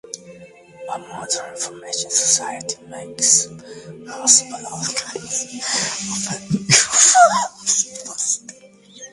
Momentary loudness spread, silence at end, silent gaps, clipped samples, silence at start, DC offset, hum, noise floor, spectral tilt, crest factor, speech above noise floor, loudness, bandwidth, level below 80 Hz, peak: 19 LU; 0.05 s; none; under 0.1%; 0.15 s; under 0.1%; none; -43 dBFS; -1 dB/octave; 20 dB; 23 dB; -17 LUFS; 11.5 kHz; -60 dBFS; 0 dBFS